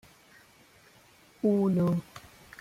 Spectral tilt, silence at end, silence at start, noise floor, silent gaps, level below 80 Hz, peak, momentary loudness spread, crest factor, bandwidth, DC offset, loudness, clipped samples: -9 dB/octave; 0.4 s; 1.45 s; -59 dBFS; none; -66 dBFS; -14 dBFS; 24 LU; 16 dB; 15.5 kHz; under 0.1%; -28 LUFS; under 0.1%